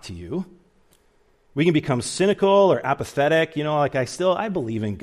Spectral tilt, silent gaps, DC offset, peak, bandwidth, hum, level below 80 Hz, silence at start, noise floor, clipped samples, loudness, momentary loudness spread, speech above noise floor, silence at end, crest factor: -5.5 dB/octave; none; under 0.1%; -6 dBFS; 14.5 kHz; none; -56 dBFS; 0.05 s; -60 dBFS; under 0.1%; -21 LUFS; 14 LU; 39 dB; 0 s; 16 dB